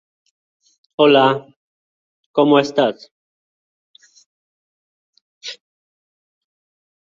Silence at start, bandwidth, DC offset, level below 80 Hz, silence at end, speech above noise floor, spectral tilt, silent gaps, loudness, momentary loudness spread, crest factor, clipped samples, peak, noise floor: 1 s; 7.6 kHz; under 0.1%; -68 dBFS; 1.55 s; over 76 dB; -5.5 dB/octave; 1.56-2.34 s, 3.11-3.94 s, 4.26-5.13 s, 5.21-5.41 s; -15 LUFS; 22 LU; 20 dB; under 0.1%; -2 dBFS; under -90 dBFS